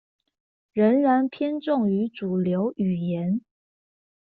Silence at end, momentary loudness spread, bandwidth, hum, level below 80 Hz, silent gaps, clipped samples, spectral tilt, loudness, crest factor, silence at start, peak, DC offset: 0.85 s; 8 LU; 4.6 kHz; none; -66 dBFS; none; under 0.1%; -7.5 dB/octave; -24 LUFS; 16 dB; 0.75 s; -10 dBFS; under 0.1%